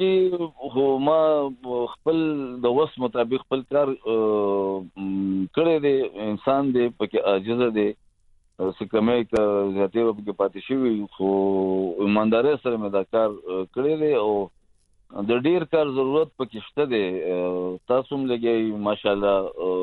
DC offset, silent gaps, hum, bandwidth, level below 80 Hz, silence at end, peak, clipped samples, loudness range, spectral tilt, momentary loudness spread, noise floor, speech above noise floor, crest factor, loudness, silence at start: under 0.1%; none; none; 4.4 kHz; -58 dBFS; 0 s; -6 dBFS; under 0.1%; 2 LU; -8.5 dB/octave; 7 LU; -60 dBFS; 37 dB; 16 dB; -23 LUFS; 0 s